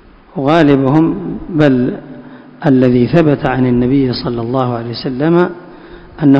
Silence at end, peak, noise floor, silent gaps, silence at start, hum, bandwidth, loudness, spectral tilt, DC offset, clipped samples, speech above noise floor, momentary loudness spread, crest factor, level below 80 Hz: 0 s; 0 dBFS; -34 dBFS; none; 0.35 s; none; 8 kHz; -13 LUFS; -9 dB/octave; under 0.1%; 0.7%; 23 dB; 11 LU; 12 dB; -38 dBFS